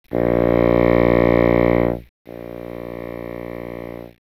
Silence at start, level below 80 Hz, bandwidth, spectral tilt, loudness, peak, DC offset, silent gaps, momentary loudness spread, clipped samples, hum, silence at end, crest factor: 0.1 s; -34 dBFS; 15 kHz; -9.5 dB/octave; -16 LUFS; -4 dBFS; under 0.1%; 2.09-2.25 s; 18 LU; under 0.1%; 60 Hz at -45 dBFS; 0.15 s; 16 dB